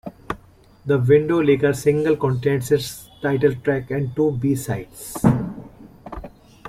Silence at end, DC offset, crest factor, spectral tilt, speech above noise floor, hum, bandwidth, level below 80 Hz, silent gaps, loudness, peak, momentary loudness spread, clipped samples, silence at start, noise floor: 0 s; under 0.1%; 18 dB; -7 dB/octave; 30 dB; none; 16 kHz; -46 dBFS; none; -20 LUFS; -2 dBFS; 17 LU; under 0.1%; 0.05 s; -50 dBFS